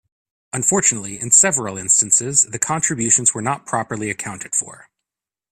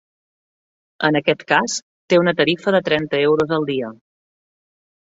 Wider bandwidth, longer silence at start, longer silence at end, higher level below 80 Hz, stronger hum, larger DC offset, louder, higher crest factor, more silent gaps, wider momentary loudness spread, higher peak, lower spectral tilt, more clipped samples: first, 15.5 kHz vs 7.8 kHz; second, 0.55 s vs 1 s; second, 0.75 s vs 1.2 s; about the same, -58 dBFS vs -60 dBFS; neither; neither; about the same, -16 LUFS vs -18 LUFS; about the same, 20 dB vs 18 dB; second, none vs 1.82-2.08 s; first, 13 LU vs 8 LU; about the same, 0 dBFS vs -2 dBFS; second, -2.5 dB/octave vs -4.5 dB/octave; neither